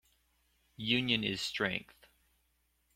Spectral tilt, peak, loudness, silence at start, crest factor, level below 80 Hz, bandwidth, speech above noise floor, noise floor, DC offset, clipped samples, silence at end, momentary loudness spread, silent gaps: -4 dB/octave; -14 dBFS; -33 LUFS; 0.8 s; 24 dB; -68 dBFS; 16.5 kHz; 42 dB; -76 dBFS; under 0.1%; under 0.1%; 1.15 s; 10 LU; none